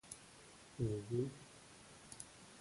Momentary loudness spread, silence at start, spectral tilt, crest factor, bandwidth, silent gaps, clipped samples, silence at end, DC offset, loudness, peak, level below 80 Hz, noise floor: 17 LU; 0.05 s; -6 dB/octave; 20 dB; 11.5 kHz; none; under 0.1%; 0 s; under 0.1%; -45 LUFS; -26 dBFS; -68 dBFS; -61 dBFS